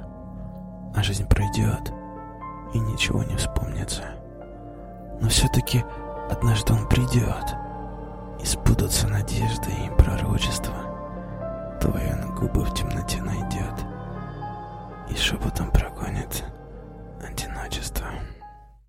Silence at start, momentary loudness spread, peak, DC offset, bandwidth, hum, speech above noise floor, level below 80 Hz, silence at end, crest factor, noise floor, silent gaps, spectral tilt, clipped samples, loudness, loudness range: 0 s; 17 LU; 0 dBFS; under 0.1%; 16 kHz; none; 22 dB; -32 dBFS; 0.15 s; 24 dB; -46 dBFS; none; -5 dB/octave; under 0.1%; -26 LUFS; 5 LU